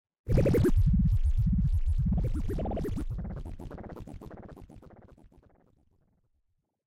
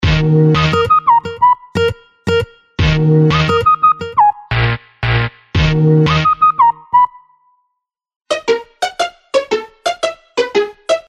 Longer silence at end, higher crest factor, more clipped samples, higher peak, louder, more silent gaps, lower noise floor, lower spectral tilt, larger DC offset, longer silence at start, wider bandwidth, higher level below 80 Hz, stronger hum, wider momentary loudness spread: first, 2.05 s vs 0.1 s; about the same, 16 dB vs 12 dB; neither; second, -12 dBFS vs -2 dBFS; second, -29 LUFS vs -14 LUFS; second, none vs 8.16-8.20 s; about the same, -77 dBFS vs -74 dBFS; first, -9 dB/octave vs -6.5 dB/octave; neither; first, 0.25 s vs 0 s; first, 15.5 kHz vs 10.5 kHz; about the same, -32 dBFS vs -30 dBFS; neither; first, 21 LU vs 9 LU